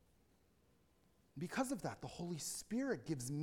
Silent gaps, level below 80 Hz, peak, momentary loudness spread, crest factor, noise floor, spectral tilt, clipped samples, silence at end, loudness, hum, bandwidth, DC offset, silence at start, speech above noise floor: none; -72 dBFS; -28 dBFS; 7 LU; 18 dB; -74 dBFS; -4.5 dB/octave; under 0.1%; 0 s; -43 LUFS; none; 17.5 kHz; under 0.1%; 1.35 s; 32 dB